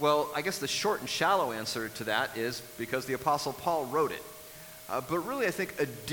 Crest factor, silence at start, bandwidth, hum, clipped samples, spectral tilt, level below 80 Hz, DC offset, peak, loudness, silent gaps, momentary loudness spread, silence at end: 20 dB; 0 s; 19 kHz; none; under 0.1%; -3.5 dB/octave; -66 dBFS; under 0.1%; -12 dBFS; -31 LUFS; none; 10 LU; 0 s